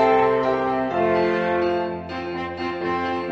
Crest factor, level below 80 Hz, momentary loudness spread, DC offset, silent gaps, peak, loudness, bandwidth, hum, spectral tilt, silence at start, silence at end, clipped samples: 16 dB; -52 dBFS; 9 LU; under 0.1%; none; -6 dBFS; -22 LUFS; 7.6 kHz; none; -7 dB/octave; 0 s; 0 s; under 0.1%